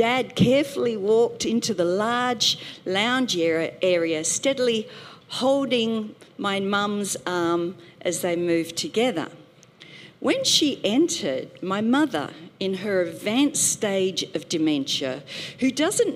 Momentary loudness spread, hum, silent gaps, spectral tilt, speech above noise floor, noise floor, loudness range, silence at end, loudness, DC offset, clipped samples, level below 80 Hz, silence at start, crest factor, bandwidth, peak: 10 LU; none; none; -3.5 dB/octave; 26 dB; -49 dBFS; 3 LU; 0 s; -23 LUFS; under 0.1%; under 0.1%; -62 dBFS; 0 s; 18 dB; 16 kHz; -6 dBFS